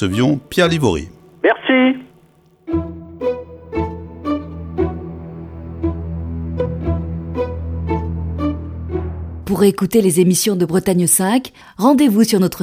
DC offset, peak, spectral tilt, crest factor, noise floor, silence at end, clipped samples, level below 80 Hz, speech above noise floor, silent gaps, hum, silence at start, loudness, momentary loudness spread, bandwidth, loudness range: under 0.1%; 0 dBFS; -5 dB/octave; 16 dB; -51 dBFS; 0 s; under 0.1%; -34 dBFS; 37 dB; none; none; 0 s; -18 LUFS; 15 LU; 16.5 kHz; 10 LU